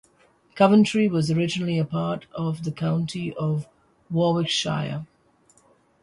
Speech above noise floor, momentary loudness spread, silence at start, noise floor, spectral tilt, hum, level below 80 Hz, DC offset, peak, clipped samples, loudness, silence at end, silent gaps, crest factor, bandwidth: 38 dB; 11 LU; 0.55 s; -60 dBFS; -6 dB/octave; none; -60 dBFS; under 0.1%; -6 dBFS; under 0.1%; -23 LUFS; 0.95 s; none; 18 dB; 11.5 kHz